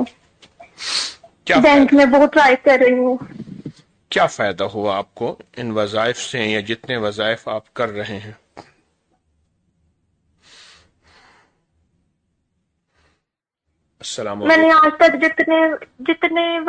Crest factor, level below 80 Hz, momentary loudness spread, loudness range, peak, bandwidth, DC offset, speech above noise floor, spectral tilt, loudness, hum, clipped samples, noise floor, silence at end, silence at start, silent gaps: 16 dB; -54 dBFS; 18 LU; 15 LU; -2 dBFS; 9.4 kHz; under 0.1%; 63 dB; -4 dB/octave; -16 LUFS; none; under 0.1%; -79 dBFS; 0 s; 0 s; none